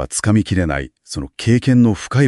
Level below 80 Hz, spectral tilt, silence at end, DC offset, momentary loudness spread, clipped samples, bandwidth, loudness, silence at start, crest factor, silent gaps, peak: -38 dBFS; -6 dB/octave; 0 s; under 0.1%; 14 LU; under 0.1%; 12 kHz; -16 LUFS; 0 s; 14 dB; none; -2 dBFS